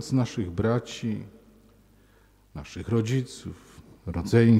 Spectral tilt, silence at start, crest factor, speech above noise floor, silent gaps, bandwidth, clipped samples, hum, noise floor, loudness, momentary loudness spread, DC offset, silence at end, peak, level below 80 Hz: -7 dB/octave; 0 s; 20 dB; 34 dB; none; 12 kHz; under 0.1%; none; -59 dBFS; -28 LUFS; 18 LU; under 0.1%; 0 s; -6 dBFS; -50 dBFS